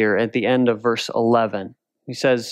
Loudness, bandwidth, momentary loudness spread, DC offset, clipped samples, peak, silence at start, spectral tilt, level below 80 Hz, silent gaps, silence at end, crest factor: -20 LUFS; 14 kHz; 13 LU; under 0.1%; under 0.1%; -4 dBFS; 0 s; -5.5 dB/octave; -70 dBFS; none; 0 s; 16 dB